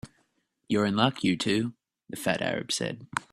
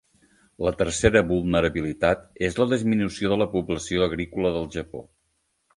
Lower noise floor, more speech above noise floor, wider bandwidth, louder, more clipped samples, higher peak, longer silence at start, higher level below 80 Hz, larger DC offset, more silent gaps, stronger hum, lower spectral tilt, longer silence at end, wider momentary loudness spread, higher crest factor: about the same, -73 dBFS vs -72 dBFS; second, 45 dB vs 49 dB; first, 15 kHz vs 11.5 kHz; second, -28 LUFS vs -24 LUFS; neither; second, -6 dBFS vs -2 dBFS; second, 0.05 s vs 0.6 s; second, -64 dBFS vs -42 dBFS; neither; neither; neither; about the same, -4.5 dB/octave vs -5.5 dB/octave; second, 0.1 s vs 0.75 s; about the same, 9 LU vs 9 LU; about the same, 22 dB vs 22 dB